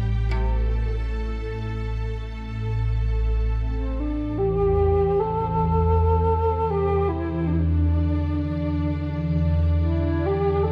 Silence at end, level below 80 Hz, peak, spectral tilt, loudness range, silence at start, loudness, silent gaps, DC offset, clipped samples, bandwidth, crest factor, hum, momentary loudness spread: 0 s; -26 dBFS; -10 dBFS; -10 dB/octave; 5 LU; 0 s; -24 LUFS; none; under 0.1%; under 0.1%; 5.6 kHz; 12 dB; none; 9 LU